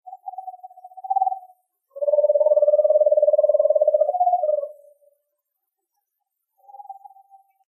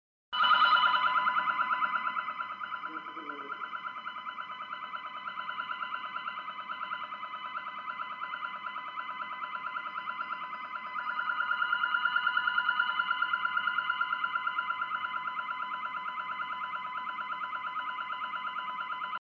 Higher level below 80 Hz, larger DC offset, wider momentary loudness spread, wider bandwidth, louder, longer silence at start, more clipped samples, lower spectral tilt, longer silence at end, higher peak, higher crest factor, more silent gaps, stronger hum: second, under -90 dBFS vs -80 dBFS; neither; first, 21 LU vs 11 LU; second, 1.3 kHz vs 7 kHz; first, -19 LUFS vs -32 LUFS; second, 0.05 s vs 0.3 s; neither; first, -6 dB/octave vs -2.5 dB/octave; first, 0.75 s vs 0.05 s; first, -6 dBFS vs -12 dBFS; about the same, 16 dB vs 20 dB; neither; neither